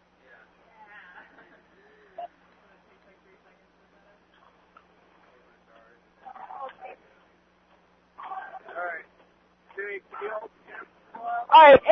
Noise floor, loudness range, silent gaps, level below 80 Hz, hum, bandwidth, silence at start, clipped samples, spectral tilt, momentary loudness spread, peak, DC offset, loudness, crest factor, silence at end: -62 dBFS; 15 LU; none; -64 dBFS; 60 Hz at -70 dBFS; 5.4 kHz; 2.2 s; under 0.1%; -0.5 dB/octave; 31 LU; -4 dBFS; under 0.1%; -20 LUFS; 24 dB; 0 s